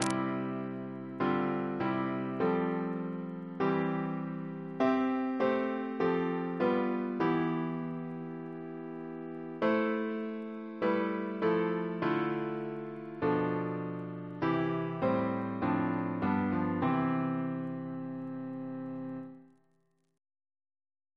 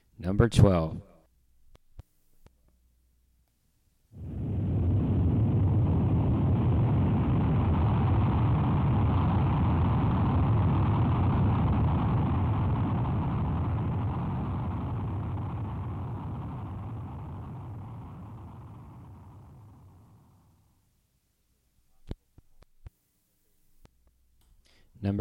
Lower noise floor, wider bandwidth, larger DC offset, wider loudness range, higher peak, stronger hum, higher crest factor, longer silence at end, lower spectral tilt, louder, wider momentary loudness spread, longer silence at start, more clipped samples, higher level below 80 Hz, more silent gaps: about the same, -75 dBFS vs -72 dBFS; about the same, 11 kHz vs 11 kHz; neither; second, 4 LU vs 17 LU; about the same, -8 dBFS vs -6 dBFS; neither; about the same, 24 dB vs 24 dB; first, 1.7 s vs 0 s; second, -7 dB/octave vs -9 dB/octave; second, -33 LUFS vs -27 LUFS; second, 11 LU vs 18 LU; second, 0 s vs 0.2 s; neither; second, -70 dBFS vs -40 dBFS; neither